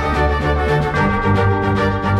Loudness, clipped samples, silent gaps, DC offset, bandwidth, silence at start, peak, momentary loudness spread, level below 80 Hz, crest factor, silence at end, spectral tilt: -17 LUFS; under 0.1%; none; under 0.1%; 10.5 kHz; 0 s; -4 dBFS; 1 LU; -26 dBFS; 12 dB; 0 s; -7.5 dB/octave